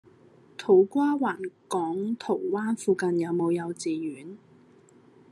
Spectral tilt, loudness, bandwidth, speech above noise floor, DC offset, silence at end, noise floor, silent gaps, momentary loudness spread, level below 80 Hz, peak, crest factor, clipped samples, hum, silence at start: -6 dB/octave; -27 LUFS; 11.5 kHz; 30 dB; under 0.1%; 0.95 s; -56 dBFS; none; 15 LU; -80 dBFS; -8 dBFS; 18 dB; under 0.1%; none; 0.6 s